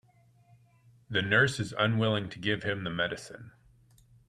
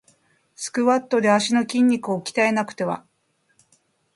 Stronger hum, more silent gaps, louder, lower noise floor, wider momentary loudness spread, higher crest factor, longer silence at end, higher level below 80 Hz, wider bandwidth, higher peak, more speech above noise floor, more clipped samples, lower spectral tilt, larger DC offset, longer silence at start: neither; neither; second, -29 LUFS vs -21 LUFS; second, -63 dBFS vs -68 dBFS; about the same, 12 LU vs 10 LU; about the same, 22 dB vs 18 dB; second, 0.8 s vs 1.15 s; first, -64 dBFS vs -70 dBFS; about the same, 12.5 kHz vs 11.5 kHz; second, -10 dBFS vs -6 dBFS; second, 33 dB vs 47 dB; neither; about the same, -5 dB/octave vs -4.5 dB/octave; neither; first, 1.1 s vs 0.6 s